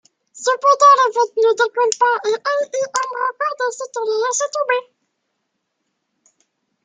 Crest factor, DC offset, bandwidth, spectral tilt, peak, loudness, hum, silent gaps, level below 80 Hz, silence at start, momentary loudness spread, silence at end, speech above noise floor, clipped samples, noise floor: 18 dB; under 0.1%; 9.6 kHz; 1 dB/octave; 0 dBFS; -17 LUFS; none; none; -80 dBFS; 0.35 s; 11 LU; 2.05 s; 57 dB; under 0.1%; -74 dBFS